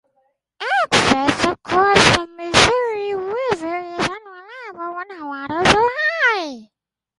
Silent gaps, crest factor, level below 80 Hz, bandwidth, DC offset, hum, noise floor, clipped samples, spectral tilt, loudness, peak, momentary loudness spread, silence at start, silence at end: none; 20 dB; -44 dBFS; 11.5 kHz; under 0.1%; none; -76 dBFS; under 0.1%; -3 dB/octave; -17 LUFS; 0 dBFS; 16 LU; 0.6 s; 0.55 s